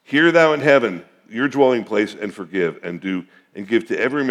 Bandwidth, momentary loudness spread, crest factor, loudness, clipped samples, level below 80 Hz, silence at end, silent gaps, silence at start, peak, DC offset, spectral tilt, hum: 11.5 kHz; 16 LU; 18 dB; -18 LUFS; under 0.1%; -78 dBFS; 0 s; none; 0.1 s; 0 dBFS; under 0.1%; -6 dB/octave; none